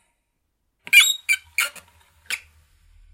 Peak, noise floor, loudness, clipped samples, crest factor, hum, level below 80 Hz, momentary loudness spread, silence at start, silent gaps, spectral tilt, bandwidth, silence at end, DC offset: 0 dBFS; -73 dBFS; -17 LUFS; under 0.1%; 24 dB; none; -62 dBFS; 17 LU; 0.95 s; none; 4 dB/octave; 16.5 kHz; 0.75 s; under 0.1%